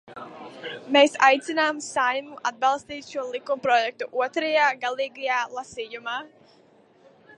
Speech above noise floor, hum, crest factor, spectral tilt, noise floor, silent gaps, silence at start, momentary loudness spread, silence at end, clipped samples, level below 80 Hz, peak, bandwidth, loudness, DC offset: 33 dB; none; 22 dB; -2 dB/octave; -57 dBFS; none; 0.05 s; 16 LU; 1.1 s; under 0.1%; -72 dBFS; -4 dBFS; 11 kHz; -24 LUFS; under 0.1%